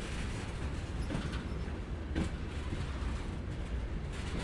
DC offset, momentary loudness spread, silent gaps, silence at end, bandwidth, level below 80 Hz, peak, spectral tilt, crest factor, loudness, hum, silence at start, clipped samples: under 0.1%; 3 LU; none; 0 s; 11.5 kHz; -40 dBFS; -22 dBFS; -6 dB/octave; 16 dB; -39 LUFS; none; 0 s; under 0.1%